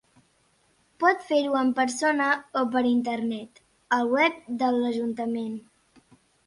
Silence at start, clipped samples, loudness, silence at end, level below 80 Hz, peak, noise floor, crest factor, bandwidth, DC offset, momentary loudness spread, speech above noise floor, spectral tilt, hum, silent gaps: 1 s; under 0.1%; -25 LUFS; 0.85 s; -70 dBFS; -6 dBFS; -66 dBFS; 20 dB; 11.5 kHz; under 0.1%; 8 LU; 41 dB; -4 dB/octave; none; none